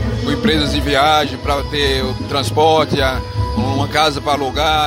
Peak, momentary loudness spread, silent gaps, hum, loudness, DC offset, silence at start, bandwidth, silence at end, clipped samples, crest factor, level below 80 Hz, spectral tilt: 0 dBFS; 6 LU; none; none; -16 LUFS; under 0.1%; 0 s; 16 kHz; 0 s; under 0.1%; 14 dB; -28 dBFS; -5 dB/octave